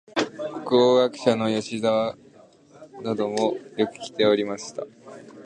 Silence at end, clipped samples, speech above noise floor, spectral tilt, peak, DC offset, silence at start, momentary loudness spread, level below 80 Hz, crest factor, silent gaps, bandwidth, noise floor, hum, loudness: 0 s; under 0.1%; 29 dB; -5 dB/octave; -6 dBFS; under 0.1%; 0.15 s; 16 LU; -68 dBFS; 20 dB; none; 10 kHz; -52 dBFS; none; -23 LUFS